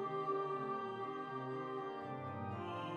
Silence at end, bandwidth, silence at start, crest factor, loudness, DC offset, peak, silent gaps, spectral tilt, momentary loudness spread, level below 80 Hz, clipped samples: 0 s; 8.4 kHz; 0 s; 14 dB; -43 LUFS; under 0.1%; -28 dBFS; none; -7.5 dB/octave; 5 LU; -84 dBFS; under 0.1%